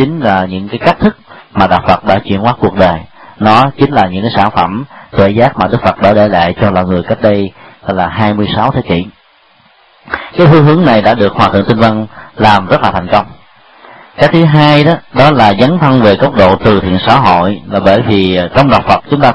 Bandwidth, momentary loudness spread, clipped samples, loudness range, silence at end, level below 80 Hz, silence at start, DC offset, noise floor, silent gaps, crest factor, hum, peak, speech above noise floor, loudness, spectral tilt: 9.8 kHz; 9 LU; 1%; 4 LU; 0 s; -34 dBFS; 0 s; under 0.1%; -46 dBFS; none; 8 dB; none; 0 dBFS; 38 dB; -9 LUFS; -8 dB/octave